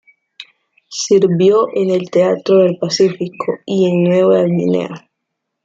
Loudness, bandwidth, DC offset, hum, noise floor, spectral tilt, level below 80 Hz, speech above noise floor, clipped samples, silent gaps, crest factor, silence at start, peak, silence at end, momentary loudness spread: -14 LUFS; 7.8 kHz; under 0.1%; none; -75 dBFS; -6 dB/octave; -62 dBFS; 62 dB; under 0.1%; none; 14 dB; 0.4 s; -2 dBFS; 0.65 s; 11 LU